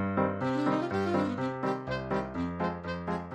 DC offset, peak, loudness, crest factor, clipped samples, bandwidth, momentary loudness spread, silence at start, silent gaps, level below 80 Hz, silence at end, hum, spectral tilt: under 0.1%; -14 dBFS; -31 LUFS; 16 dB; under 0.1%; 9.4 kHz; 5 LU; 0 s; none; -56 dBFS; 0 s; none; -7.5 dB/octave